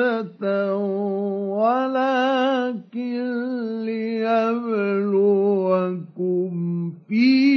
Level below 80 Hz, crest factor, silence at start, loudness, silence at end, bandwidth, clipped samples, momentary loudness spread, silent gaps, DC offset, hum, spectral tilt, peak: -84 dBFS; 14 dB; 0 s; -22 LUFS; 0 s; 6.4 kHz; under 0.1%; 8 LU; none; under 0.1%; none; -8 dB/octave; -8 dBFS